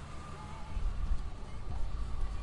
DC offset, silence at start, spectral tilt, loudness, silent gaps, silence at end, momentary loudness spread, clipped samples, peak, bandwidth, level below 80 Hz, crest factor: under 0.1%; 0 s; -6 dB/octave; -42 LUFS; none; 0 s; 6 LU; under 0.1%; -22 dBFS; 10.5 kHz; -38 dBFS; 12 dB